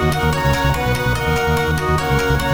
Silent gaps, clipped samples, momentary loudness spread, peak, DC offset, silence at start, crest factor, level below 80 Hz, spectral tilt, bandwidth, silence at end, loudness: none; under 0.1%; 1 LU; -4 dBFS; 0.5%; 0 s; 14 dB; -26 dBFS; -5.5 dB/octave; over 20 kHz; 0 s; -17 LUFS